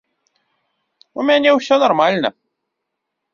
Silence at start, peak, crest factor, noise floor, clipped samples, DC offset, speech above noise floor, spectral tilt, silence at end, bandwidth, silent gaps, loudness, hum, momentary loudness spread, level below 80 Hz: 1.15 s; -2 dBFS; 18 dB; -77 dBFS; under 0.1%; under 0.1%; 63 dB; -4.5 dB/octave; 1.05 s; 7.4 kHz; none; -15 LUFS; none; 10 LU; -64 dBFS